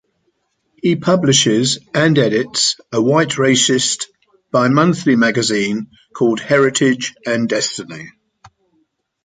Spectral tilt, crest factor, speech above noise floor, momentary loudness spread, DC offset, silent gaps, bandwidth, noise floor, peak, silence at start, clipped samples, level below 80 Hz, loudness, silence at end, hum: -4 dB/octave; 16 dB; 51 dB; 9 LU; under 0.1%; none; 9.6 kHz; -66 dBFS; 0 dBFS; 0.85 s; under 0.1%; -58 dBFS; -15 LUFS; 1.15 s; none